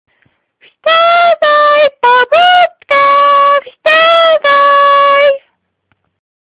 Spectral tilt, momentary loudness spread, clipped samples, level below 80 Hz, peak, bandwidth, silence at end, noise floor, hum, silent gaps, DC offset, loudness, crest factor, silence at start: -2.5 dB/octave; 4 LU; under 0.1%; -58 dBFS; 0 dBFS; 8.4 kHz; 1.05 s; -62 dBFS; none; none; under 0.1%; -7 LUFS; 8 dB; 0.85 s